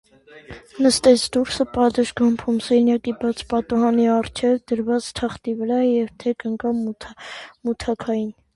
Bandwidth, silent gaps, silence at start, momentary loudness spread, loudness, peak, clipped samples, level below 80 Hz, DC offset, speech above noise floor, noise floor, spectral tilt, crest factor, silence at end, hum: 11.5 kHz; none; 0.35 s; 12 LU; -21 LUFS; -2 dBFS; under 0.1%; -50 dBFS; under 0.1%; 22 dB; -43 dBFS; -4.5 dB/octave; 18 dB; 0.25 s; none